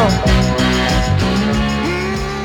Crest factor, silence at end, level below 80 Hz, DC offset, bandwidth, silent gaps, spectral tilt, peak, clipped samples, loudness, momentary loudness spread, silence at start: 10 dB; 0 s; -22 dBFS; under 0.1%; 18 kHz; none; -5.5 dB/octave; -4 dBFS; under 0.1%; -15 LUFS; 4 LU; 0 s